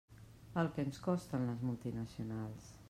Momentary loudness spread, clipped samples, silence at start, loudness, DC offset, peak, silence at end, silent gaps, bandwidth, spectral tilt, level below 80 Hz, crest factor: 9 LU; under 0.1%; 0.1 s; -40 LUFS; under 0.1%; -22 dBFS; 0 s; none; 15 kHz; -7.5 dB/octave; -64 dBFS; 18 dB